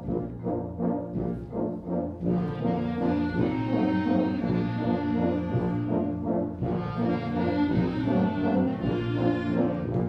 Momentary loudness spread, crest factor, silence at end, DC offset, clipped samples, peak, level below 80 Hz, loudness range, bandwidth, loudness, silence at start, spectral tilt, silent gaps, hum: 6 LU; 14 dB; 0 s; under 0.1%; under 0.1%; -12 dBFS; -48 dBFS; 2 LU; 6 kHz; -28 LUFS; 0 s; -10 dB/octave; none; none